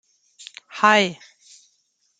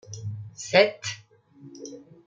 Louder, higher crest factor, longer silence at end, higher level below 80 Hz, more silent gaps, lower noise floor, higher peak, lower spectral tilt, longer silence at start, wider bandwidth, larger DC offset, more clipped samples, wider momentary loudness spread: first, -18 LUFS vs -24 LUFS; about the same, 22 dB vs 24 dB; first, 1.05 s vs 0.25 s; about the same, -76 dBFS vs -72 dBFS; neither; first, -68 dBFS vs -52 dBFS; about the same, -2 dBFS vs -4 dBFS; about the same, -3.5 dB/octave vs -3.5 dB/octave; first, 0.75 s vs 0.1 s; about the same, 9.4 kHz vs 9.2 kHz; neither; neither; first, 25 LU vs 22 LU